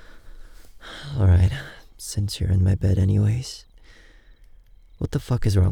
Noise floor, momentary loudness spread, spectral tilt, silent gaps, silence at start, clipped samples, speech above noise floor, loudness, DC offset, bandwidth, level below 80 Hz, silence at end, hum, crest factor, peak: -49 dBFS; 18 LU; -6.5 dB/octave; none; 0.1 s; under 0.1%; 29 dB; -22 LUFS; under 0.1%; 13 kHz; -38 dBFS; 0 s; none; 16 dB; -8 dBFS